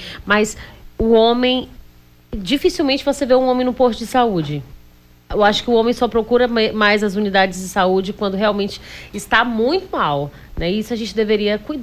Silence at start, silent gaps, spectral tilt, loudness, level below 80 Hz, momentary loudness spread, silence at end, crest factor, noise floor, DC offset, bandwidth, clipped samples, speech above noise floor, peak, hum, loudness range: 0 s; none; -4.5 dB/octave; -17 LUFS; -40 dBFS; 11 LU; 0 s; 14 dB; -47 dBFS; under 0.1%; 16 kHz; under 0.1%; 30 dB; -2 dBFS; 60 Hz at -45 dBFS; 3 LU